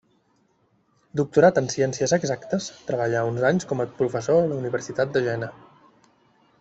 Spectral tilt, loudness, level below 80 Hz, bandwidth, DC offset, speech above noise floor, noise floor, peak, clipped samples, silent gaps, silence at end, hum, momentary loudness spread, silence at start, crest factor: -5.5 dB/octave; -23 LUFS; -62 dBFS; 8.2 kHz; under 0.1%; 43 dB; -65 dBFS; -4 dBFS; under 0.1%; none; 1.05 s; none; 10 LU; 1.15 s; 20 dB